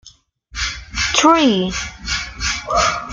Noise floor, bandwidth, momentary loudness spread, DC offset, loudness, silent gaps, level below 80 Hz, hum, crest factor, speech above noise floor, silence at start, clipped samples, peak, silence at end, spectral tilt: -48 dBFS; 10 kHz; 12 LU; under 0.1%; -17 LUFS; none; -34 dBFS; none; 18 dB; 33 dB; 0.05 s; under 0.1%; 0 dBFS; 0 s; -3 dB/octave